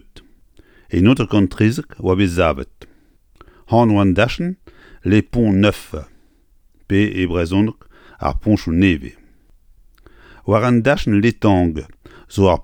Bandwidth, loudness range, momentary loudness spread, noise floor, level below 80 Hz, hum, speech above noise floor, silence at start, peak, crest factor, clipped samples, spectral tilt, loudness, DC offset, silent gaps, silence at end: 17 kHz; 2 LU; 13 LU; -53 dBFS; -36 dBFS; none; 38 dB; 0.15 s; 0 dBFS; 16 dB; under 0.1%; -7.5 dB/octave; -17 LUFS; under 0.1%; none; 0 s